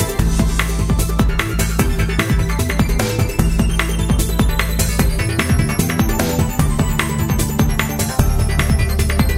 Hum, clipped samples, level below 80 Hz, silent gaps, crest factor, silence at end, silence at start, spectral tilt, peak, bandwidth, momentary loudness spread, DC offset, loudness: none; under 0.1%; -20 dBFS; none; 16 dB; 0 s; 0 s; -5 dB/octave; 0 dBFS; 16.5 kHz; 2 LU; under 0.1%; -17 LUFS